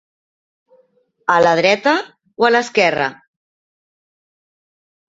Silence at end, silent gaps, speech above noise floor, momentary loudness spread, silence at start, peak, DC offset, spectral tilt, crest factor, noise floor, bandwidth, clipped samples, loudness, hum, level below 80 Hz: 2 s; none; 44 dB; 10 LU; 1.3 s; -2 dBFS; under 0.1%; -4 dB/octave; 18 dB; -58 dBFS; 7.8 kHz; under 0.1%; -15 LUFS; none; -62 dBFS